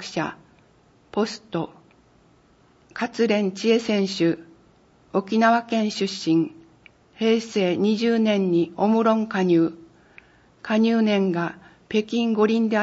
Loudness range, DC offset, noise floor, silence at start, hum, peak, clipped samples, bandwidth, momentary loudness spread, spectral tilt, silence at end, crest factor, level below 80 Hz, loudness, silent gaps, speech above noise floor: 4 LU; under 0.1%; -57 dBFS; 0 s; none; -6 dBFS; under 0.1%; 8 kHz; 11 LU; -6 dB/octave; 0 s; 18 dB; -66 dBFS; -22 LUFS; none; 36 dB